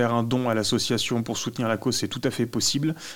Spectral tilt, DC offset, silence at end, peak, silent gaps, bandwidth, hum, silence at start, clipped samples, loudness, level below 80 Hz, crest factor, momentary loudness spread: -4 dB/octave; 0.5%; 0 s; -8 dBFS; none; 18 kHz; none; 0 s; under 0.1%; -25 LUFS; -58 dBFS; 16 dB; 4 LU